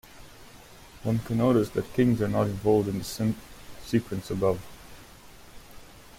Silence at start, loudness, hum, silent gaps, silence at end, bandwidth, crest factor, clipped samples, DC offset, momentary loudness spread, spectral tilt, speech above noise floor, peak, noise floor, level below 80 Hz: 0.15 s; -27 LUFS; none; none; 0.1 s; 16.5 kHz; 18 dB; under 0.1%; under 0.1%; 20 LU; -7 dB/octave; 24 dB; -10 dBFS; -49 dBFS; -50 dBFS